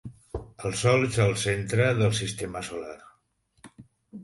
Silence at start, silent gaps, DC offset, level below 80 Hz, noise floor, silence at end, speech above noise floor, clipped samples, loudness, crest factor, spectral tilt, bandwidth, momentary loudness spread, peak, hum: 0.05 s; none; under 0.1%; -50 dBFS; -69 dBFS; 0 s; 44 dB; under 0.1%; -26 LUFS; 18 dB; -5 dB/octave; 11.5 kHz; 17 LU; -10 dBFS; none